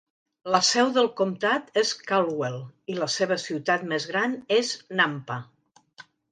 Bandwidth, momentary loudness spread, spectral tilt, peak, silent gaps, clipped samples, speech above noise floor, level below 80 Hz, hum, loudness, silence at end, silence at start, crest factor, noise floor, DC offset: 9.8 kHz; 12 LU; -3 dB/octave; -6 dBFS; none; under 0.1%; 27 dB; -74 dBFS; none; -25 LUFS; 0.3 s; 0.45 s; 20 dB; -52 dBFS; under 0.1%